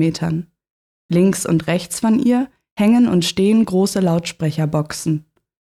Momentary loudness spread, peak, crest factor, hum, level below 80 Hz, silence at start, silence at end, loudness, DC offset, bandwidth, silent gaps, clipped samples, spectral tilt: 8 LU; -4 dBFS; 12 dB; none; -52 dBFS; 0 s; 0.45 s; -18 LUFS; under 0.1%; 14.5 kHz; 0.70-1.09 s, 2.72-2.76 s; under 0.1%; -6 dB/octave